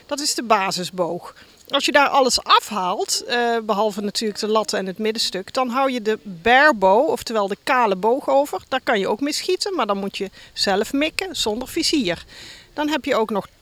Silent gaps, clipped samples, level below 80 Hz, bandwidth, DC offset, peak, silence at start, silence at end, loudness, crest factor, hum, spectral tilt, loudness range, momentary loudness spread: none; under 0.1%; -54 dBFS; 18 kHz; under 0.1%; 0 dBFS; 0.1 s; 0.15 s; -20 LUFS; 20 dB; none; -2.5 dB/octave; 4 LU; 9 LU